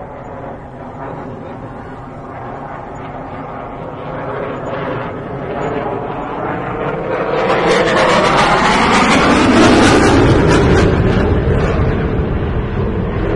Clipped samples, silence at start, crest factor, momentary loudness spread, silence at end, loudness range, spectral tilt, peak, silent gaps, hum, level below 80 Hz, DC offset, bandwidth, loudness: under 0.1%; 0 s; 14 dB; 19 LU; 0 s; 17 LU; -5.5 dB/octave; 0 dBFS; none; none; -26 dBFS; under 0.1%; 11.5 kHz; -13 LUFS